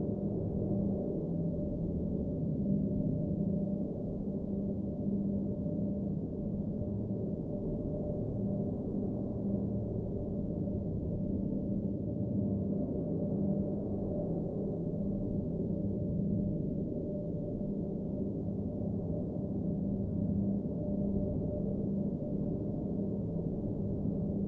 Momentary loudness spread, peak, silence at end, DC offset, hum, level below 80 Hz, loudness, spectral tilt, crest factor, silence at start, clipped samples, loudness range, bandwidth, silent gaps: 3 LU; -20 dBFS; 0 s; under 0.1%; none; -48 dBFS; -35 LUFS; -13.5 dB/octave; 14 dB; 0 s; under 0.1%; 2 LU; 1.5 kHz; none